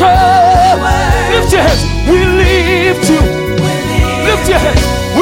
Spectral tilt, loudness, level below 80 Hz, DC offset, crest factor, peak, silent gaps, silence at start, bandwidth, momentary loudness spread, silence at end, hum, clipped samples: -5 dB/octave; -10 LUFS; -18 dBFS; under 0.1%; 8 dB; 0 dBFS; none; 0 s; 16.5 kHz; 6 LU; 0 s; none; under 0.1%